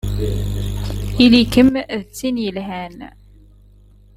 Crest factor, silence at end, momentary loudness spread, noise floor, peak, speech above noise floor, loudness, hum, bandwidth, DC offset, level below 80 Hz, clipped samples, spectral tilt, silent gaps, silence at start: 18 dB; 1.05 s; 17 LU; -47 dBFS; 0 dBFS; 30 dB; -17 LUFS; 50 Hz at -35 dBFS; 15.5 kHz; under 0.1%; -30 dBFS; under 0.1%; -6 dB/octave; none; 0.05 s